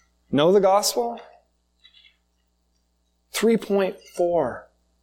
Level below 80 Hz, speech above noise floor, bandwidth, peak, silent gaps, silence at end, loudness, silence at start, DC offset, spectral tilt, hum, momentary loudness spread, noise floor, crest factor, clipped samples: -62 dBFS; 48 dB; 17 kHz; -6 dBFS; none; 0.4 s; -22 LUFS; 0.3 s; under 0.1%; -4.5 dB/octave; 60 Hz at -60 dBFS; 13 LU; -69 dBFS; 18 dB; under 0.1%